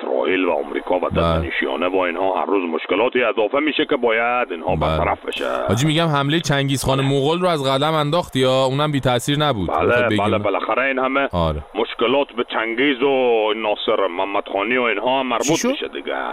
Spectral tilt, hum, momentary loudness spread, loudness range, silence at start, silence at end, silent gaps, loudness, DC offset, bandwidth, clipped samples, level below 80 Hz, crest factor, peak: -5 dB/octave; none; 5 LU; 1 LU; 0 s; 0 s; none; -19 LUFS; under 0.1%; 16 kHz; under 0.1%; -40 dBFS; 14 dB; -4 dBFS